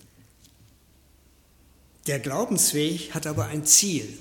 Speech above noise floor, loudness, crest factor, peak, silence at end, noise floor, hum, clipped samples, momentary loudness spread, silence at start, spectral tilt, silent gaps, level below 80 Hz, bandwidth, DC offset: 34 dB; -22 LUFS; 24 dB; -4 dBFS; 0 s; -58 dBFS; none; under 0.1%; 13 LU; 2.05 s; -2.5 dB/octave; none; -58 dBFS; 17.5 kHz; under 0.1%